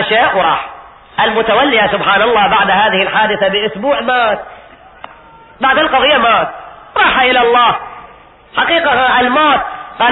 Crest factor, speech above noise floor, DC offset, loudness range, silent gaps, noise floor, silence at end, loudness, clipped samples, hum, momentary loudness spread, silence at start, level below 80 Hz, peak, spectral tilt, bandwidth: 12 dB; 28 dB; under 0.1%; 3 LU; none; -39 dBFS; 0 s; -11 LUFS; under 0.1%; none; 11 LU; 0 s; -44 dBFS; 0 dBFS; -9.5 dB/octave; 4.1 kHz